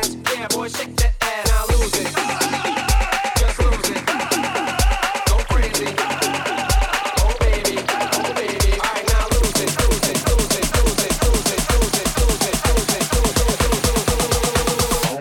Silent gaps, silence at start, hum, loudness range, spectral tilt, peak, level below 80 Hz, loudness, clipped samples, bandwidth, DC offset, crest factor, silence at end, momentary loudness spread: none; 0 s; none; 1 LU; -3.5 dB/octave; -2 dBFS; -22 dBFS; -19 LUFS; under 0.1%; 18.5 kHz; under 0.1%; 16 dB; 0 s; 3 LU